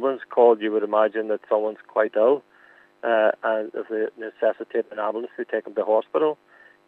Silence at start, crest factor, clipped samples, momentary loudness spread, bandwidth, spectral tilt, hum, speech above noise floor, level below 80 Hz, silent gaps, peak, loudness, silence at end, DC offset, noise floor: 0 s; 18 dB; under 0.1%; 10 LU; 4.1 kHz; -7 dB/octave; none; 32 dB; -86 dBFS; none; -4 dBFS; -23 LUFS; 0.55 s; under 0.1%; -54 dBFS